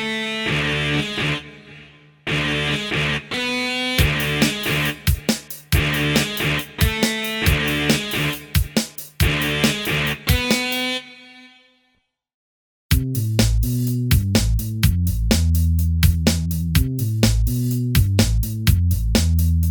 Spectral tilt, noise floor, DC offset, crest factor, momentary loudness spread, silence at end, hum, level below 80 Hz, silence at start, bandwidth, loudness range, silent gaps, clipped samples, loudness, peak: -4.5 dB/octave; -67 dBFS; under 0.1%; 20 dB; 4 LU; 0 s; none; -26 dBFS; 0 s; over 20 kHz; 4 LU; 12.34-12.89 s; under 0.1%; -20 LUFS; 0 dBFS